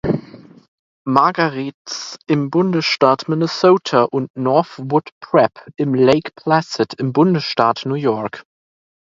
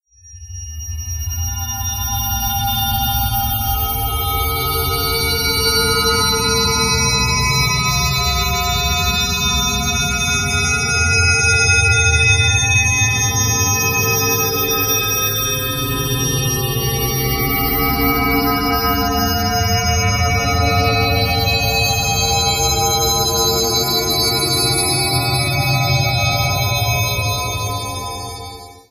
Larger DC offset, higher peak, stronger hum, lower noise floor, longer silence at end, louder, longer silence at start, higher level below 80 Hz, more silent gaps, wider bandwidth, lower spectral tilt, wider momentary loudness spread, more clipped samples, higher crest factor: neither; about the same, 0 dBFS vs -2 dBFS; neither; about the same, -39 dBFS vs -38 dBFS; first, 0.7 s vs 0.1 s; about the same, -17 LUFS vs -15 LUFS; second, 0.05 s vs 0.25 s; second, -54 dBFS vs -28 dBFS; first, 0.68-1.05 s, 1.74-1.85 s, 4.30-4.34 s, 5.12-5.21 s vs none; second, 7.6 kHz vs 15 kHz; first, -6 dB/octave vs -3 dB/octave; first, 10 LU vs 7 LU; neither; about the same, 18 dB vs 16 dB